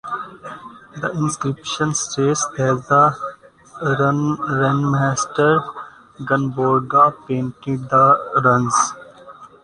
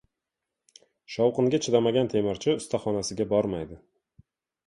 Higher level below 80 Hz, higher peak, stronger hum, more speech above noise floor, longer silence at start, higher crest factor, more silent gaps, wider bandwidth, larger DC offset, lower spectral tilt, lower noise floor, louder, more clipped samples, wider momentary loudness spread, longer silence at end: about the same, -56 dBFS vs -58 dBFS; first, -2 dBFS vs -8 dBFS; neither; second, 24 dB vs 61 dB; second, 0.05 s vs 1.1 s; about the same, 18 dB vs 20 dB; neither; about the same, 10.5 kHz vs 11.5 kHz; neither; about the same, -5 dB/octave vs -5.5 dB/octave; second, -42 dBFS vs -86 dBFS; first, -18 LUFS vs -26 LUFS; neither; first, 18 LU vs 9 LU; second, 0.15 s vs 0.9 s